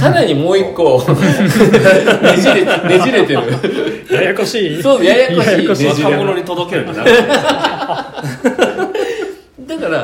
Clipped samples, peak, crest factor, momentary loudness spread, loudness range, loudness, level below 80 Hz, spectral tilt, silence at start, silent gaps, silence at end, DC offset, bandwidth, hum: 0.8%; 0 dBFS; 12 dB; 10 LU; 4 LU; -12 LUFS; -46 dBFS; -5.5 dB/octave; 0 s; none; 0 s; under 0.1%; 17 kHz; none